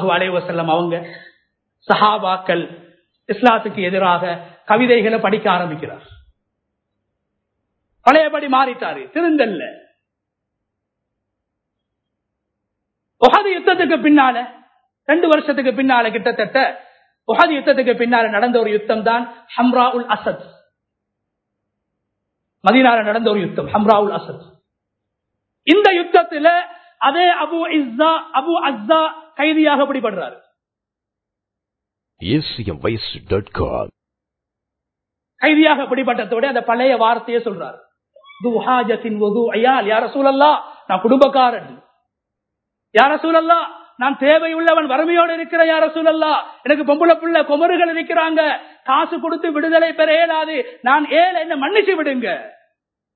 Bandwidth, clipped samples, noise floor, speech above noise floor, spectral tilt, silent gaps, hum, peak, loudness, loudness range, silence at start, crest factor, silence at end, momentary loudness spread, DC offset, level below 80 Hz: 8 kHz; under 0.1%; -84 dBFS; 68 dB; -7 dB/octave; none; none; 0 dBFS; -16 LUFS; 6 LU; 0 s; 18 dB; 0.65 s; 10 LU; under 0.1%; -50 dBFS